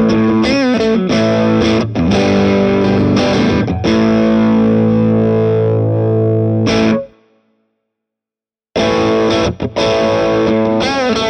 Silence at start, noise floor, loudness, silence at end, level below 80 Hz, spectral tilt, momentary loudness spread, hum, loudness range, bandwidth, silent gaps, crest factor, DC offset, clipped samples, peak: 0 s; -90 dBFS; -13 LUFS; 0 s; -36 dBFS; -6.5 dB/octave; 3 LU; none; 5 LU; 8.8 kHz; none; 12 dB; under 0.1%; under 0.1%; 0 dBFS